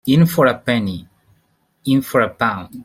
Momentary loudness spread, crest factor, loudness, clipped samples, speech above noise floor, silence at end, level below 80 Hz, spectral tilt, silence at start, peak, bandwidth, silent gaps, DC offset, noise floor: 12 LU; 16 dB; -17 LUFS; under 0.1%; 46 dB; 0 s; -54 dBFS; -6.5 dB/octave; 0.05 s; -2 dBFS; 16.5 kHz; none; under 0.1%; -62 dBFS